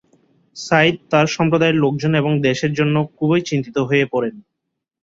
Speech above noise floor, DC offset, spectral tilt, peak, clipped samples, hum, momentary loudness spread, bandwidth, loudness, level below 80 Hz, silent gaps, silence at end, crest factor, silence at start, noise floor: 61 dB; under 0.1%; -6 dB/octave; -2 dBFS; under 0.1%; none; 6 LU; 7.8 kHz; -17 LUFS; -56 dBFS; none; 0.65 s; 16 dB; 0.55 s; -78 dBFS